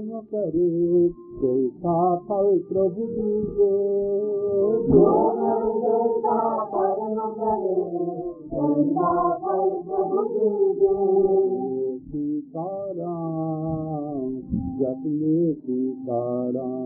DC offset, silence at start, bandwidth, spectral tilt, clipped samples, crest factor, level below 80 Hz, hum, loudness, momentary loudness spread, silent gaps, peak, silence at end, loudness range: under 0.1%; 0 s; 1.8 kHz; -8.5 dB/octave; under 0.1%; 18 dB; -50 dBFS; none; -23 LUFS; 9 LU; none; -6 dBFS; 0 s; 5 LU